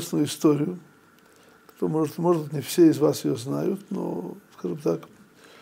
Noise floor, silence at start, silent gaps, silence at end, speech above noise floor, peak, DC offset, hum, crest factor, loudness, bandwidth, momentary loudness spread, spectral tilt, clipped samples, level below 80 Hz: -55 dBFS; 0 s; none; 0.55 s; 32 dB; -8 dBFS; under 0.1%; none; 18 dB; -25 LUFS; 16 kHz; 14 LU; -6.5 dB/octave; under 0.1%; -74 dBFS